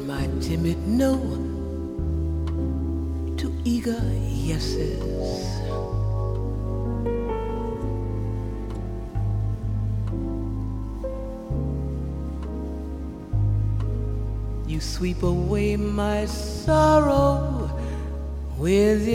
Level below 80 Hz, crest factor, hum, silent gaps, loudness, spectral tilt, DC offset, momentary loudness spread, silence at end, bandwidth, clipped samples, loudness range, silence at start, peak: -30 dBFS; 18 dB; none; none; -26 LUFS; -7 dB/octave; under 0.1%; 11 LU; 0 s; 15.5 kHz; under 0.1%; 7 LU; 0 s; -6 dBFS